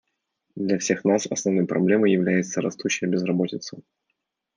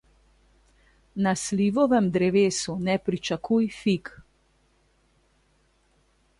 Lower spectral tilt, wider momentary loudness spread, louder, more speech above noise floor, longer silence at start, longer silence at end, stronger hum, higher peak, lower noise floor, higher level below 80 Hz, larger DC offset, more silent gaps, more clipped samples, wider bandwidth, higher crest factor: about the same, -5 dB/octave vs -5.5 dB/octave; about the same, 9 LU vs 8 LU; about the same, -23 LUFS vs -24 LUFS; first, 56 dB vs 42 dB; second, 0.55 s vs 1.15 s; second, 0.75 s vs 2.2 s; neither; first, -6 dBFS vs -10 dBFS; first, -78 dBFS vs -65 dBFS; second, -72 dBFS vs -58 dBFS; neither; neither; neither; second, 10 kHz vs 11.5 kHz; about the same, 16 dB vs 16 dB